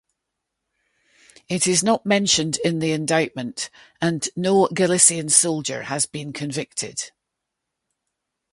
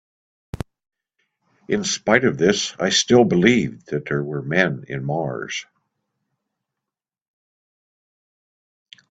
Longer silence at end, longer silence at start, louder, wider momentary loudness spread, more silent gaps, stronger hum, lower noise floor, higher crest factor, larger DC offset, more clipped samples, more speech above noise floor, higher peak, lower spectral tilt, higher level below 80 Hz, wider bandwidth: second, 1.45 s vs 3.55 s; first, 1.5 s vs 0.55 s; about the same, -20 LUFS vs -20 LUFS; second, 14 LU vs 17 LU; neither; neither; second, -81 dBFS vs -87 dBFS; about the same, 22 dB vs 22 dB; neither; neither; second, 60 dB vs 68 dB; about the same, 0 dBFS vs 0 dBFS; about the same, -3 dB/octave vs -4 dB/octave; second, -62 dBFS vs -54 dBFS; first, 11.5 kHz vs 9.2 kHz